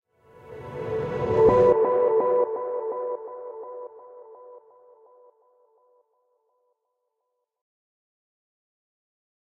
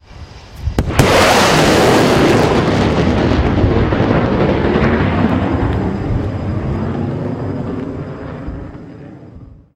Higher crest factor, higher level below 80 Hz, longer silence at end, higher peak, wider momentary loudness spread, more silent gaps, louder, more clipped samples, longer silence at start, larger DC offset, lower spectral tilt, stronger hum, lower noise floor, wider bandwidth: first, 20 dB vs 14 dB; second, -54 dBFS vs -26 dBFS; first, 4.95 s vs 0.2 s; second, -8 dBFS vs 0 dBFS; first, 22 LU vs 17 LU; neither; second, -23 LUFS vs -14 LUFS; neither; first, 0.45 s vs 0.1 s; neither; first, -8.5 dB/octave vs -5.5 dB/octave; neither; first, -80 dBFS vs -37 dBFS; second, 6.6 kHz vs 16 kHz